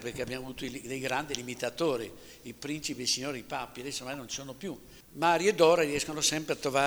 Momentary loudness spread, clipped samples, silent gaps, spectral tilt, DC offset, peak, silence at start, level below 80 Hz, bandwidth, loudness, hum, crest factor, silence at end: 17 LU; under 0.1%; none; -3 dB/octave; under 0.1%; -8 dBFS; 0 s; -60 dBFS; over 20 kHz; -30 LUFS; none; 22 dB; 0 s